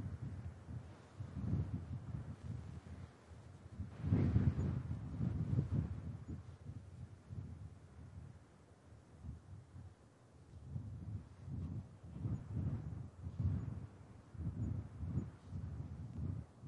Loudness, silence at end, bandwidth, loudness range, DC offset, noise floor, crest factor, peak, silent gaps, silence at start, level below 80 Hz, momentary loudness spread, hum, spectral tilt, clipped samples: -44 LUFS; 0 s; 10.5 kHz; 15 LU; under 0.1%; -63 dBFS; 24 dB; -20 dBFS; none; 0 s; -56 dBFS; 19 LU; none; -9.5 dB/octave; under 0.1%